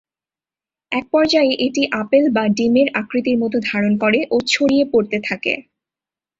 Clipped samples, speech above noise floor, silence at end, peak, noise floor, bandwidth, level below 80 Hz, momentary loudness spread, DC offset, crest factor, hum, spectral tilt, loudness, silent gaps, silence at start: under 0.1%; over 73 dB; 0.8 s; -2 dBFS; under -90 dBFS; 7.8 kHz; -58 dBFS; 6 LU; under 0.1%; 16 dB; none; -4.5 dB/octave; -17 LUFS; none; 0.9 s